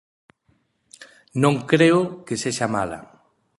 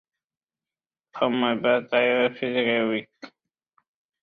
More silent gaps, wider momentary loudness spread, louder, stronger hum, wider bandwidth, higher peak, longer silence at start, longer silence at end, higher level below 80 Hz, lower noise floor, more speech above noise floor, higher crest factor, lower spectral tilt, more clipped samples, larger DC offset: neither; first, 14 LU vs 6 LU; about the same, -21 LUFS vs -23 LUFS; neither; first, 11.5 kHz vs 6.4 kHz; about the same, -4 dBFS vs -6 dBFS; second, 1 s vs 1.15 s; second, 0.6 s vs 0.95 s; first, -58 dBFS vs -70 dBFS; second, -66 dBFS vs under -90 dBFS; second, 46 dB vs over 67 dB; about the same, 20 dB vs 20 dB; second, -5.5 dB/octave vs -7 dB/octave; neither; neither